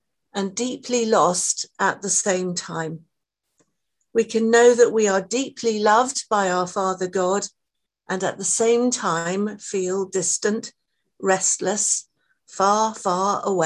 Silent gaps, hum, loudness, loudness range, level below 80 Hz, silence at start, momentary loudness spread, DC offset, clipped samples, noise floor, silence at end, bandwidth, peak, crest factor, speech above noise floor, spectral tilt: none; none; -21 LUFS; 4 LU; -70 dBFS; 0.35 s; 10 LU; under 0.1%; under 0.1%; -81 dBFS; 0 s; 12 kHz; -4 dBFS; 18 dB; 60 dB; -3 dB/octave